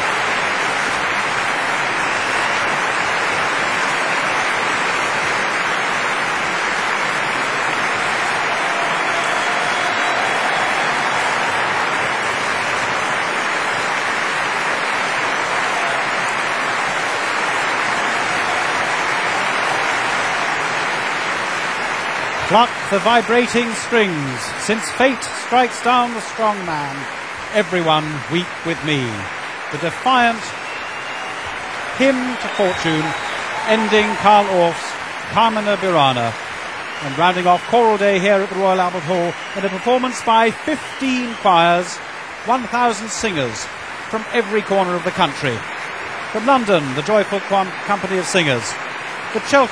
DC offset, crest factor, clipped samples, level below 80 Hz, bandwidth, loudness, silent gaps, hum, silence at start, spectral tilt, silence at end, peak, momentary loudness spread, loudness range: 0.2%; 18 dB; under 0.1%; -54 dBFS; 13.5 kHz; -18 LUFS; none; none; 0 s; -3.5 dB/octave; 0 s; 0 dBFS; 9 LU; 3 LU